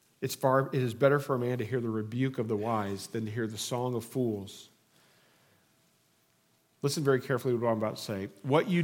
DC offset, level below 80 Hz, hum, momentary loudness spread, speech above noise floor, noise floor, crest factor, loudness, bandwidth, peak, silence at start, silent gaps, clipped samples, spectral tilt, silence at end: under 0.1%; -80 dBFS; none; 9 LU; 40 dB; -70 dBFS; 22 dB; -31 LUFS; 17 kHz; -10 dBFS; 0.2 s; none; under 0.1%; -6 dB/octave; 0 s